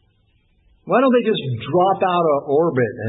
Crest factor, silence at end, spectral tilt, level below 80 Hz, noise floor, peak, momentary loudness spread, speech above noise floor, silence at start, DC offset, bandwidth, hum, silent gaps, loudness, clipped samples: 14 dB; 0 s; -11.5 dB/octave; -62 dBFS; -60 dBFS; -4 dBFS; 5 LU; 43 dB; 0.85 s; under 0.1%; 4 kHz; none; none; -18 LUFS; under 0.1%